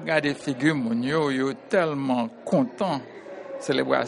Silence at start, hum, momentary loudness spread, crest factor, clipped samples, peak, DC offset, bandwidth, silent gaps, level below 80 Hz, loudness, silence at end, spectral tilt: 0 s; none; 10 LU; 18 dB; under 0.1%; -6 dBFS; under 0.1%; 11 kHz; none; -68 dBFS; -25 LUFS; 0 s; -6 dB/octave